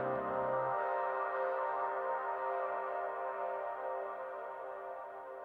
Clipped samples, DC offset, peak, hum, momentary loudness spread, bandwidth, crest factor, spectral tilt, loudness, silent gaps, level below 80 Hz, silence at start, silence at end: under 0.1%; under 0.1%; -24 dBFS; none; 9 LU; 4.9 kHz; 14 dB; -7.5 dB/octave; -38 LUFS; none; -76 dBFS; 0 s; 0 s